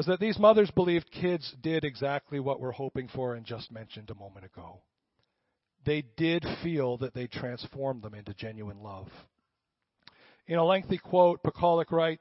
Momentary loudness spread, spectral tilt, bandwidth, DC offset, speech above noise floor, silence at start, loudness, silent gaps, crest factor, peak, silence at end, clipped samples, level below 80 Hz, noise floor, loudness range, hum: 21 LU; -10 dB/octave; 5.8 kHz; under 0.1%; 55 dB; 0 s; -29 LUFS; none; 22 dB; -8 dBFS; 0.05 s; under 0.1%; -60 dBFS; -84 dBFS; 11 LU; none